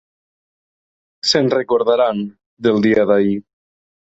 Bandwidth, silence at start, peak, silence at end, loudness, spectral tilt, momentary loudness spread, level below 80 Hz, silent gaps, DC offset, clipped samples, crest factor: 8.2 kHz; 1.25 s; -2 dBFS; 0.75 s; -16 LUFS; -5 dB/octave; 10 LU; -58 dBFS; 2.46-2.57 s; under 0.1%; under 0.1%; 16 dB